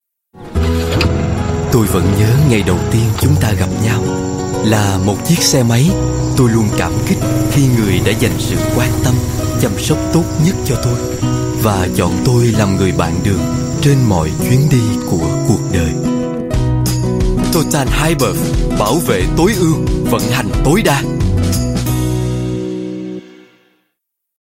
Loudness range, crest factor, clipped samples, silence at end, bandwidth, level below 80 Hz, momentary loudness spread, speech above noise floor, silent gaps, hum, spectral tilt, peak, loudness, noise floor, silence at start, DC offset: 2 LU; 14 dB; under 0.1%; 1.1 s; 16.5 kHz; -26 dBFS; 5 LU; 60 dB; none; none; -5.5 dB/octave; 0 dBFS; -14 LUFS; -73 dBFS; 0.35 s; under 0.1%